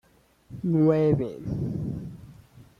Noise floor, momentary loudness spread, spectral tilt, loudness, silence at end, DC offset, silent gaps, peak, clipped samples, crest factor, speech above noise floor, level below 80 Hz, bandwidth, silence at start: -56 dBFS; 21 LU; -10.5 dB/octave; -26 LUFS; 0.15 s; under 0.1%; none; -10 dBFS; under 0.1%; 18 dB; 32 dB; -50 dBFS; 6.6 kHz; 0.5 s